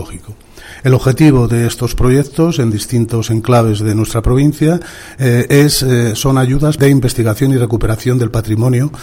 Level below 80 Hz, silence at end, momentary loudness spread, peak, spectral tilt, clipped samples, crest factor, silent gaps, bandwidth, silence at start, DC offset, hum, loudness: -26 dBFS; 0 s; 6 LU; 0 dBFS; -6.5 dB/octave; under 0.1%; 12 dB; none; 16.5 kHz; 0 s; under 0.1%; none; -12 LUFS